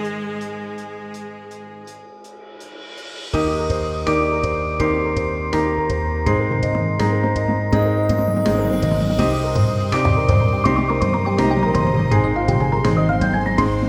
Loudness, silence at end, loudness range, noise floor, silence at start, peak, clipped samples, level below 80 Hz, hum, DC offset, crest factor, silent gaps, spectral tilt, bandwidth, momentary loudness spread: -19 LUFS; 0 s; 9 LU; -40 dBFS; 0 s; -2 dBFS; under 0.1%; -32 dBFS; none; under 0.1%; 16 dB; none; -7.5 dB/octave; 15.5 kHz; 17 LU